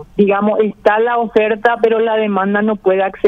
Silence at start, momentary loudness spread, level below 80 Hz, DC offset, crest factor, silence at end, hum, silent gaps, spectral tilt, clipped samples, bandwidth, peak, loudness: 0 s; 2 LU; -50 dBFS; under 0.1%; 14 dB; 0 s; none; none; -8 dB/octave; under 0.1%; 5.8 kHz; 0 dBFS; -14 LUFS